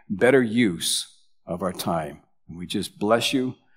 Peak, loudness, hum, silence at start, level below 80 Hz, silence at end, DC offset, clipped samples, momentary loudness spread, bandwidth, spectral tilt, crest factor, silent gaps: -4 dBFS; -23 LUFS; none; 0.1 s; -60 dBFS; 0.25 s; under 0.1%; under 0.1%; 18 LU; 16 kHz; -4 dB/octave; 20 dB; none